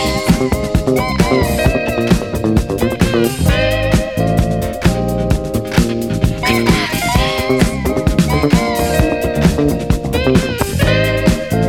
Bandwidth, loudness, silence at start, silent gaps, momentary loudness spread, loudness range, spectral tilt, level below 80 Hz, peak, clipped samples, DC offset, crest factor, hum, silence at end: 18.5 kHz; -15 LUFS; 0 s; none; 3 LU; 1 LU; -5.5 dB/octave; -22 dBFS; 0 dBFS; under 0.1%; 0.7%; 14 dB; none; 0 s